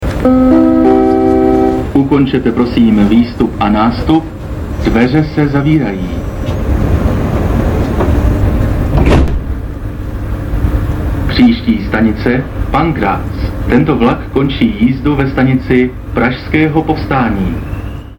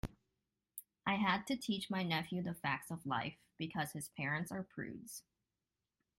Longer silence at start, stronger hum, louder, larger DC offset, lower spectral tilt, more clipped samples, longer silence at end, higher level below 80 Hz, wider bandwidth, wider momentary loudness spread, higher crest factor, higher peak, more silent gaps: about the same, 0 s vs 0.05 s; neither; first, -12 LUFS vs -40 LUFS; neither; first, -8 dB/octave vs -4.5 dB/octave; neither; second, 0.05 s vs 1 s; first, -20 dBFS vs -64 dBFS; about the same, 18 kHz vs 16.5 kHz; second, 10 LU vs 15 LU; second, 10 dB vs 20 dB; first, 0 dBFS vs -22 dBFS; neither